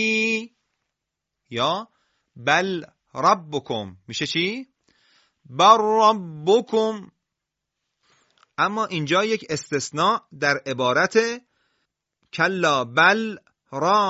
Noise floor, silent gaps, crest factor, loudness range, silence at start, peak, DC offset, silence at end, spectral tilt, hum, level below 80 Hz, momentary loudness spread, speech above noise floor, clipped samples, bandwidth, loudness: -83 dBFS; none; 22 dB; 4 LU; 0 s; 0 dBFS; under 0.1%; 0 s; -4 dB/octave; none; -66 dBFS; 15 LU; 62 dB; under 0.1%; 8 kHz; -21 LUFS